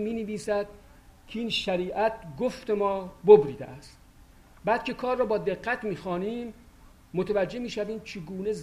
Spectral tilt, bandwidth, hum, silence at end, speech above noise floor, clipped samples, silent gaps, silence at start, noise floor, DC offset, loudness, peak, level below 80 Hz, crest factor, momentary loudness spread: -5.5 dB/octave; 11.5 kHz; none; 0 s; 27 dB; under 0.1%; none; 0 s; -54 dBFS; under 0.1%; -27 LUFS; -4 dBFS; -54 dBFS; 24 dB; 14 LU